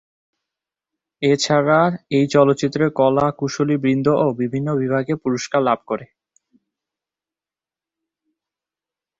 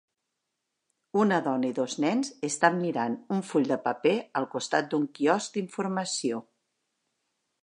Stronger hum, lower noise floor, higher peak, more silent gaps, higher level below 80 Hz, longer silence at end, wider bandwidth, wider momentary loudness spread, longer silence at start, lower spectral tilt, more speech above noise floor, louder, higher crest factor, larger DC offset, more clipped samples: first, 50 Hz at -45 dBFS vs none; first, under -90 dBFS vs -83 dBFS; first, -2 dBFS vs -6 dBFS; neither; first, -58 dBFS vs -80 dBFS; first, 3.15 s vs 1.2 s; second, 7.8 kHz vs 11 kHz; about the same, 7 LU vs 7 LU; about the same, 1.2 s vs 1.15 s; first, -6 dB/octave vs -4.5 dB/octave; first, over 72 dB vs 55 dB; first, -19 LUFS vs -28 LUFS; second, 18 dB vs 24 dB; neither; neither